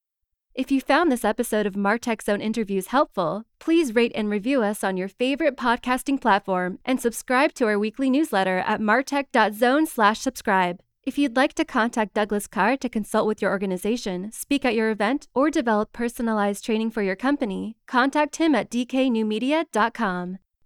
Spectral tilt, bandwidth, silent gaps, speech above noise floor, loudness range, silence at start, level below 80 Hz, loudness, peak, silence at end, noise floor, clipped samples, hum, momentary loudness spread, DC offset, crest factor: -4.5 dB/octave; 17 kHz; none; 58 dB; 2 LU; 0.55 s; -54 dBFS; -23 LUFS; -6 dBFS; 0.3 s; -81 dBFS; under 0.1%; none; 6 LU; under 0.1%; 16 dB